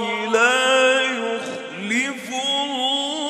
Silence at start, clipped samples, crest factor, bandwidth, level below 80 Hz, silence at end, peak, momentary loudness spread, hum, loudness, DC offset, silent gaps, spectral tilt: 0 s; under 0.1%; 18 dB; 14 kHz; -76 dBFS; 0 s; -4 dBFS; 11 LU; none; -19 LUFS; under 0.1%; none; -1.5 dB/octave